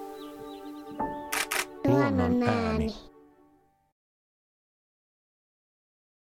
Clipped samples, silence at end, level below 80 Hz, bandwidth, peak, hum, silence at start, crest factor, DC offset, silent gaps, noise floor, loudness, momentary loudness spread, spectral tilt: under 0.1%; 3.2 s; -50 dBFS; 17 kHz; -12 dBFS; none; 0 s; 20 dB; under 0.1%; none; -64 dBFS; -28 LUFS; 18 LU; -5 dB/octave